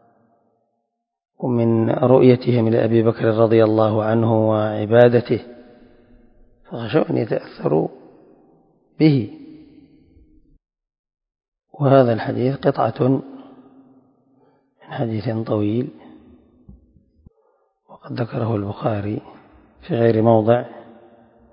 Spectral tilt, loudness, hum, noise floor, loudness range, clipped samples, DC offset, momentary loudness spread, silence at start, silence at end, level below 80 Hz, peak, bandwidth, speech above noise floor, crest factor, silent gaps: -11.5 dB/octave; -18 LUFS; none; -76 dBFS; 11 LU; under 0.1%; under 0.1%; 13 LU; 1.4 s; 0.7 s; -56 dBFS; 0 dBFS; 5.4 kHz; 59 dB; 20 dB; 10.99-11.04 s, 11.48-11.52 s